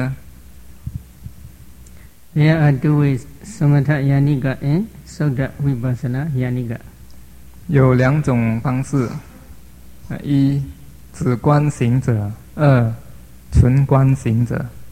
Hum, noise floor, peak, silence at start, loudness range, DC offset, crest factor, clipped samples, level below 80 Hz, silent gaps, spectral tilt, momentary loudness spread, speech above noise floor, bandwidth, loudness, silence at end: none; -43 dBFS; 0 dBFS; 0 s; 4 LU; 0.6%; 18 dB; under 0.1%; -36 dBFS; none; -8.5 dB/octave; 18 LU; 27 dB; 13.5 kHz; -17 LUFS; 0 s